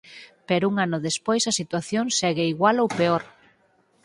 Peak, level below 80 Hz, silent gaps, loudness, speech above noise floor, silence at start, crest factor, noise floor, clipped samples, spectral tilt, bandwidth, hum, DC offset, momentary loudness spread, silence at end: -6 dBFS; -66 dBFS; none; -23 LUFS; 40 dB; 0.05 s; 18 dB; -63 dBFS; under 0.1%; -4 dB/octave; 11.5 kHz; none; under 0.1%; 6 LU; 0.75 s